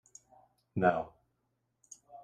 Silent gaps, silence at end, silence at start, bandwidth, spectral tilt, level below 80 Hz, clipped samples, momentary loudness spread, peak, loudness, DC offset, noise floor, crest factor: none; 0.05 s; 0.75 s; 9.8 kHz; -6.5 dB/octave; -70 dBFS; under 0.1%; 25 LU; -12 dBFS; -32 LUFS; under 0.1%; -80 dBFS; 24 dB